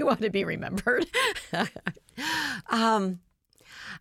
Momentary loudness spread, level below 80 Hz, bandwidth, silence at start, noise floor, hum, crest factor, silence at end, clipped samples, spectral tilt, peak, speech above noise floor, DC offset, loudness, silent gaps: 13 LU; -58 dBFS; 16.5 kHz; 0 s; -55 dBFS; none; 18 dB; 0 s; under 0.1%; -4 dB/octave; -12 dBFS; 27 dB; under 0.1%; -28 LUFS; none